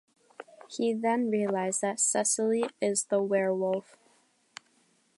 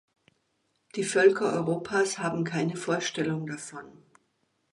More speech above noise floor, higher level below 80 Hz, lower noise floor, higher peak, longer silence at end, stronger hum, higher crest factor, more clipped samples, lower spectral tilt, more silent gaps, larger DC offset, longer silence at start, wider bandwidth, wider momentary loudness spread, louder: second, 40 dB vs 47 dB; second, -84 dBFS vs -70 dBFS; second, -68 dBFS vs -74 dBFS; second, -14 dBFS vs -8 dBFS; first, 1.35 s vs 0.85 s; neither; about the same, 16 dB vs 20 dB; neither; about the same, -3.5 dB/octave vs -4.5 dB/octave; neither; neither; second, 0.4 s vs 0.95 s; about the same, 11.5 kHz vs 11.5 kHz; first, 23 LU vs 16 LU; about the same, -28 LUFS vs -27 LUFS